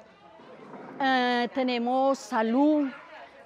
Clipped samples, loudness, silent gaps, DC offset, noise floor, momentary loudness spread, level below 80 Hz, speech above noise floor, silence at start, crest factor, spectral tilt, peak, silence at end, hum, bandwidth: under 0.1%; -26 LUFS; none; under 0.1%; -51 dBFS; 21 LU; -80 dBFS; 26 dB; 0.5 s; 16 dB; -4 dB/octave; -12 dBFS; 0.2 s; none; 11 kHz